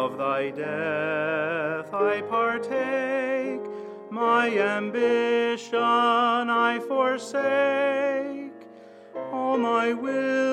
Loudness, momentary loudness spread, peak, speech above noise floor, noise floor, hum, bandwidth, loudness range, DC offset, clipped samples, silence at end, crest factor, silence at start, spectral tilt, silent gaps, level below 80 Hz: -25 LUFS; 10 LU; -8 dBFS; 23 dB; -47 dBFS; none; 10.5 kHz; 3 LU; under 0.1%; under 0.1%; 0 s; 16 dB; 0 s; -5 dB/octave; none; -82 dBFS